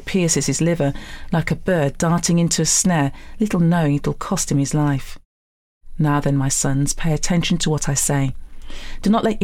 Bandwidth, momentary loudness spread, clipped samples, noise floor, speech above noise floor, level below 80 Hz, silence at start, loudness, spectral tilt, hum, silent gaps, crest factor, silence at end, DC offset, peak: 16 kHz; 7 LU; under 0.1%; under -90 dBFS; over 71 dB; -34 dBFS; 0 s; -19 LUFS; -4.5 dB/octave; none; 5.25-5.81 s; 12 dB; 0 s; under 0.1%; -8 dBFS